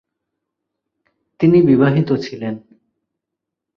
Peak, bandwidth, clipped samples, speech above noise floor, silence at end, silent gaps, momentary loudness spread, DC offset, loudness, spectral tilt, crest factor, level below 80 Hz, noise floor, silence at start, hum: -2 dBFS; 6.6 kHz; under 0.1%; 67 dB; 1.2 s; none; 16 LU; under 0.1%; -15 LUFS; -9 dB/octave; 16 dB; -54 dBFS; -82 dBFS; 1.4 s; none